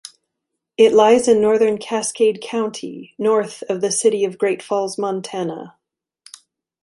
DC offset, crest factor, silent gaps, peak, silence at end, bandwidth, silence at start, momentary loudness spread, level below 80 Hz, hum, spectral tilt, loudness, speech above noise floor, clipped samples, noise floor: under 0.1%; 18 dB; none; -2 dBFS; 1.15 s; 11.5 kHz; 0.8 s; 13 LU; -64 dBFS; none; -4 dB/octave; -18 LUFS; 63 dB; under 0.1%; -80 dBFS